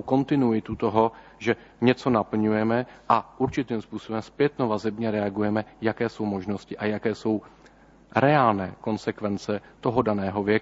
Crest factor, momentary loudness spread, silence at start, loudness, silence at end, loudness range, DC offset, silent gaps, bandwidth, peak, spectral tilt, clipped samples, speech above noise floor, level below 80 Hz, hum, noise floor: 20 dB; 8 LU; 0 s; -26 LUFS; 0 s; 3 LU; under 0.1%; none; 8 kHz; -4 dBFS; -7.5 dB/octave; under 0.1%; 29 dB; -56 dBFS; none; -53 dBFS